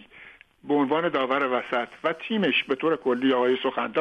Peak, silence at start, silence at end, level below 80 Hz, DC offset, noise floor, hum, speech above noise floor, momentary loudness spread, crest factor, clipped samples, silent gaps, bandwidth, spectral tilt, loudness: -12 dBFS; 0.15 s; 0 s; -68 dBFS; under 0.1%; -50 dBFS; none; 26 dB; 5 LU; 14 dB; under 0.1%; none; 8.2 kHz; -6.5 dB/octave; -25 LUFS